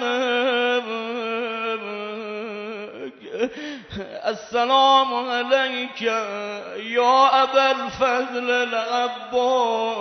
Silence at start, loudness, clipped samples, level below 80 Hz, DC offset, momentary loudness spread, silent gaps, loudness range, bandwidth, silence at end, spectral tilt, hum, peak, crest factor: 0 s; -21 LUFS; under 0.1%; -62 dBFS; under 0.1%; 15 LU; none; 9 LU; 6.4 kHz; 0 s; -3 dB/octave; none; -4 dBFS; 18 dB